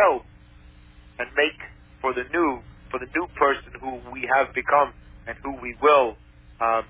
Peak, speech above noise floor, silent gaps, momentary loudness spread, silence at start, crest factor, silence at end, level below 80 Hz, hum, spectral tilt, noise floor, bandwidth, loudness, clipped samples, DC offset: -6 dBFS; 26 dB; none; 15 LU; 0 s; 20 dB; 0.05 s; -50 dBFS; 60 Hz at -50 dBFS; -8 dB/octave; -49 dBFS; 4 kHz; -24 LUFS; under 0.1%; under 0.1%